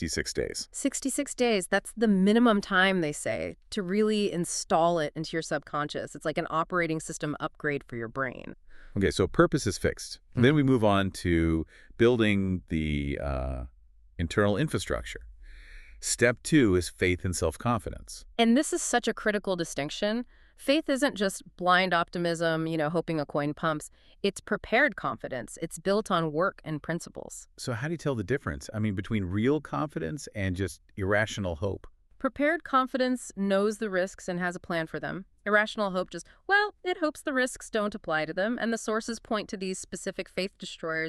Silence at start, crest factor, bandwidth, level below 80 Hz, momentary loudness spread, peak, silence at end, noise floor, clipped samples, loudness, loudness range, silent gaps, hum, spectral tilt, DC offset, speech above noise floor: 0 s; 20 dB; 13.5 kHz; -48 dBFS; 12 LU; -8 dBFS; 0 s; -47 dBFS; under 0.1%; -28 LUFS; 5 LU; none; none; -5 dB/octave; under 0.1%; 19 dB